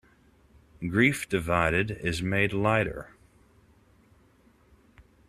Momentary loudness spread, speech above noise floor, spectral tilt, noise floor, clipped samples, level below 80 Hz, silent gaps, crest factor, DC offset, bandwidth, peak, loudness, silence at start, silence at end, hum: 12 LU; 35 dB; -5.5 dB/octave; -61 dBFS; under 0.1%; -52 dBFS; none; 22 dB; under 0.1%; 14 kHz; -8 dBFS; -26 LUFS; 0.8 s; 0.25 s; none